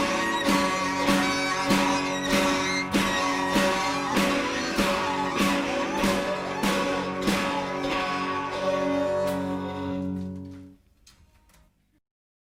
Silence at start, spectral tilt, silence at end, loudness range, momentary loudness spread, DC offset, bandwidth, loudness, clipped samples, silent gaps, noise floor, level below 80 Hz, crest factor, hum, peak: 0 s; -4 dB/octave; 1.7 s; 6 LU; 7 LU; under 0.1%; 16 kHz; -25 LUFS; under 0.1%; none; -61 dBFS; -50 dBFS; 18 dB; none; -8 dBFS